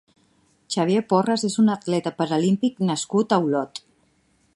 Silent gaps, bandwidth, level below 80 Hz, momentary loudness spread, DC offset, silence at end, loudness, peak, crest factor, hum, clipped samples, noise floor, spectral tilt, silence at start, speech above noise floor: none; 11.5 kHz; -68 dBFS; 6 LU; under 0.1%; 0.8 s; -22 LUFS; -4 dBFS; 20 dB; none; under 0.1%; -64 dBFS; -5.5 dB/octave; 0.7 s; 42 dB